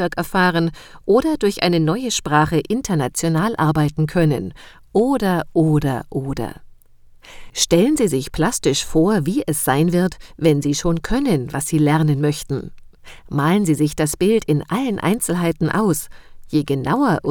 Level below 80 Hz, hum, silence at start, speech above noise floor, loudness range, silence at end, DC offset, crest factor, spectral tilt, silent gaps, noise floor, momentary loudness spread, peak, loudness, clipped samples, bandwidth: -40 dBFS; none; 0 s; 28 dB; 2 LU; 0 s; under 0.1%; 18 dB; -5.5 dB/octave; none; -46 dBFS; 8 LU; 0 dBFS; -19 LUFS; under 0.1%; 20 kHz